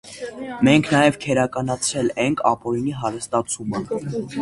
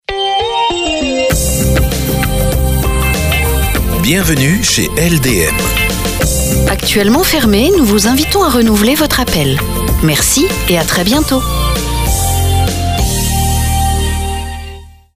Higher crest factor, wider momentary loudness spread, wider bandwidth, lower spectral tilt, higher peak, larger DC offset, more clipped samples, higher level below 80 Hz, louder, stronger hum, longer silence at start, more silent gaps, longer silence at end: first, 20 dB vs 12 dB; first, 10 LU vs 5 LU; second, 11.5 kHz vs 16 kHz; about the same, -5 dB/octave vs -4 dB/octave; about the same, -2 dBFS vs 0 dBFS; neither; neither; second, -52 dBFS vs -18 dBFS; second, -21 LUFS vs -12 LUFS; neither; about the same, 0.05 s vs 0.1 s; neither; second, 0 s vs 0.25 s